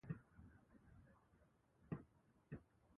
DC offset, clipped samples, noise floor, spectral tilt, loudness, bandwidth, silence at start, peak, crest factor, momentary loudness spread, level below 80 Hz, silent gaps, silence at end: under 0.1%; under 0.1%; -76 dBFS; -8 dB/octave; -58 LUFS; 3.6 kHz; 0.05 s; -34 dBFS; 24 dB; 14 LU; -74 dBFS; none; 0 s